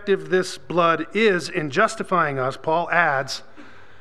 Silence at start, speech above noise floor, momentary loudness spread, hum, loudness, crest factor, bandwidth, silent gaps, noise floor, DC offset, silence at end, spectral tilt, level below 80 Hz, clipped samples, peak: 0 s; 25 dB; 6 LU; none; -21 LUFS; 20 dB; 13 kHz; none; -46 dBFS; 1%; 0.3 s; -4.5 dB/octave; -64 dBFS; under 0.1%; -2 dBFS